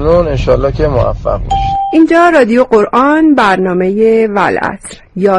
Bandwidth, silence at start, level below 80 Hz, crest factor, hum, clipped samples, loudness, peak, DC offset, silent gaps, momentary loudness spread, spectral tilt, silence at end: 11.5 kHz; 0 s; -24 dBFS; 10 dB; none; 0.2%; -10 LUFS; 0 dBFS; under 0.1%; none; 8 LU; -7 dB/octave; 0 s